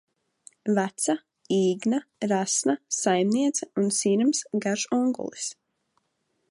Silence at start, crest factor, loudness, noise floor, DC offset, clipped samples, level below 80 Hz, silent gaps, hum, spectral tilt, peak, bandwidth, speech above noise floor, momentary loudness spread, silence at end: 0.65 s; 16 dB; -25 LUFS; -75 dBFS; under 0.1%; under 0.1%; -78 dBFS; none; none; -4 dB/octave; -10 dBFS; 11.5 kHz; 50 dB; 8 LU; 1 s